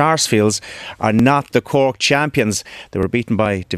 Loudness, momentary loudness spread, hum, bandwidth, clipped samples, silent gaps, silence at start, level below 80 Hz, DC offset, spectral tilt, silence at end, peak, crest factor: -17 LUFS; 9 LU; none; 14 kHz; under 0.1%; none; 0 s; -46 dBFS; under 0.1%; -4.5 dB/octave; 0 s; 0 dBFS; 16 dB